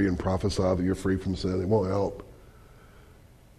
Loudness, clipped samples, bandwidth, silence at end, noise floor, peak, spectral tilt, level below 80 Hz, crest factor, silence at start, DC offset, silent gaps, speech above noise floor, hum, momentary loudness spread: -27 LUFS; under 0.1%; 13 kHz; 0.45 s; -53 dBFS; -12 dBFS; -7 dB/octave; -46 dBFS; 16 dB; 0 s; under 0.1%; none; 27 dB; none; 4 LU